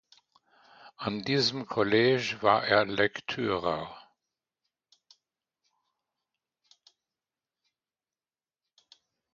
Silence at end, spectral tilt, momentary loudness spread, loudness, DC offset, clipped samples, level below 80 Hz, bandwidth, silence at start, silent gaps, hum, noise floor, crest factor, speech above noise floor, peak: 5.35 s; -5 dB/octave; 11 LU; -27 LUFS; under 0.1%; under 0.1%; -66 dBFS; 7.6 kHz; 0.85 s; none; none; under -90 dBFS; 24 dB; over 63 dB; -8 dBFS